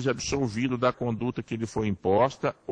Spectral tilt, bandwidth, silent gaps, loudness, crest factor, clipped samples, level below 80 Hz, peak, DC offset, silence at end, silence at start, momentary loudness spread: -5.5 dB/octave; 10 kHz; none; -27 LUFS; 16 dB; under 0.1%; -52 dBFS; -10 dBFS; under 0.1%; 0 s; 0 s; 8 LU